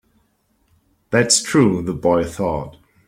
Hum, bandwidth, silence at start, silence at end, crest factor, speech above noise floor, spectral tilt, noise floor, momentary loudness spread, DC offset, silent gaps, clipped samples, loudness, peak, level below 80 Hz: none; 16.5 kHz; 1.1 s; 0.4 s; 20 dB; 46 dB; -4 dB/octave; -64 dBFS; 10 LU; under 0.1%; none; under 0.1%; -18 LUFS; 0 dBFS; -46 dBFS